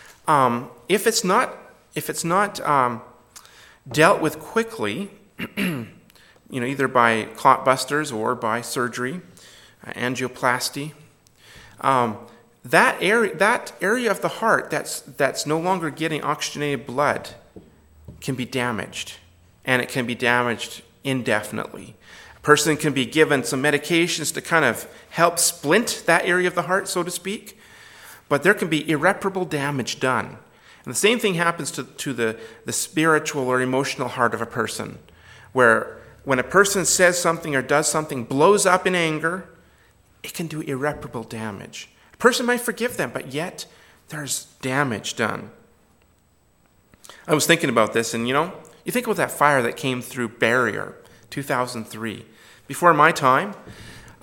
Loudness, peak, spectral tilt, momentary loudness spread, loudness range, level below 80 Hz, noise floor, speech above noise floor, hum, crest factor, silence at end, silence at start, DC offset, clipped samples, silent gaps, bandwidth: -21 LUFS; 0 dBFS; -3.5 dB/octave; 16 LU; 6 LU; -60 dBFS; -60 dBFS; 39 dB; none; 22 dB; 0.1 s; 0.1 s; under 0.1%; under 0.1%; none; 17.5 kHz